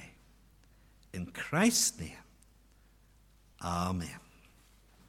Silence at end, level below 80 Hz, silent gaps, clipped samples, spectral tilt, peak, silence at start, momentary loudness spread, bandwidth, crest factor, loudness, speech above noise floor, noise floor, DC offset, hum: 0.9 s; -58 dBFS; none; under 0.1%; -3.5 dB/octave; -14 dBFS; 0 s; 24 LU; 17 kHz; 22 dB; -32 LUFS; 31 dB; -63 dBFS; under 0.1%; none